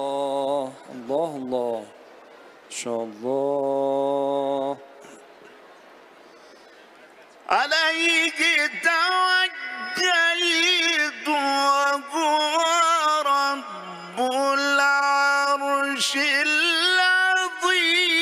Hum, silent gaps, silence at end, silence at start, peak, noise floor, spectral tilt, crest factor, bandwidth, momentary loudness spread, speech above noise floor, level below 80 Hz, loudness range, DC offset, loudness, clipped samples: none; none; 0 s; 0 s; -6 dBFS; -49 dBFS; -1 dB/octave; 18 dB; 15.5 kHz; 11 LU; 27 dB; -78 dBFS; 9 LU; under 0.1%; -21 LUFS; under 0.1%